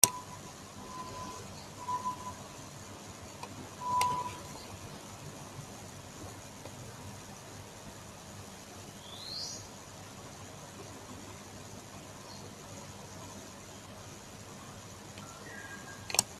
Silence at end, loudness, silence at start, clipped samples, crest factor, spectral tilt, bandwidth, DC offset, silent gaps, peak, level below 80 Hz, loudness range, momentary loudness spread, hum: 0 s; -41 LUFS; 0 s; under 0.1%; 40 dB; -2 dB/octave; 15.5 kHz; under 0.1%; none; -2 dBFS; -64 dBFS; 9 LU; 11 LU; none